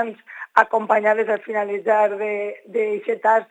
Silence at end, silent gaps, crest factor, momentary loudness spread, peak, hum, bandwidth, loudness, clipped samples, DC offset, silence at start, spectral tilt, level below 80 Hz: 0.05 s; none; 20 dB; 8 LU; 0 dBFS; none; 9.2 kHz; -20 LUFS; under 0.1%; under 0.1%; 0 s; -5.5 dB/octave; -78 dBFS